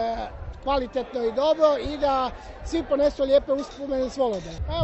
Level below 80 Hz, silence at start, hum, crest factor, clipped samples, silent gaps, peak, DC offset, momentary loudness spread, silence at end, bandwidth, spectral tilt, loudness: -40 dBFS; 0 s; none; 18 dB; under 0.1%; none; -6 dBFS; under 0.1%; 11 LU; 0 s; 8.2 kHz; -6 dB/octave; -25 LUFS